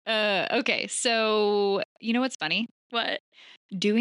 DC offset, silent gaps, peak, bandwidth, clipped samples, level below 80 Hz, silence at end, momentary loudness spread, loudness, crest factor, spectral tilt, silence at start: under 0.1%; 1.85-1.96 s, 2.35-2.40 s, 2.71-2.90 s, 3.20-3.32 s, 3.57-3.69 s; -10 dBFS; 11.5 kHz; under 0.1%; -84 dBFS; 0 s; 7 LU; -26 LUFS; 18 dB; -3 dB/octave; 0.05 s